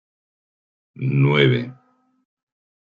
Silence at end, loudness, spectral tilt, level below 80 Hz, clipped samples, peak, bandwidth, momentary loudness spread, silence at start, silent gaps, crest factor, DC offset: 1.15 s; -19 LUFS; -8.5 dB/octave; -62 dBFS; under 0.1%; -2 dBFS; 5 kHz; 13 LU; 1 s; none; 20 dB; under 0.1%